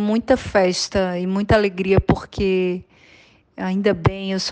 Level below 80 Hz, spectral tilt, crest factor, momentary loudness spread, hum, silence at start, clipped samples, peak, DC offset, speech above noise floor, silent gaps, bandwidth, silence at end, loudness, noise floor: -36 dBFS; -5.5 dB/octave; 16 dB; 7 LU; none; 0 s; under 0.1%; -4 dBFS; under 0.1%; 32 dB; none; 9.6 kHz; 0 s; -20 LUFS; -51 dBFS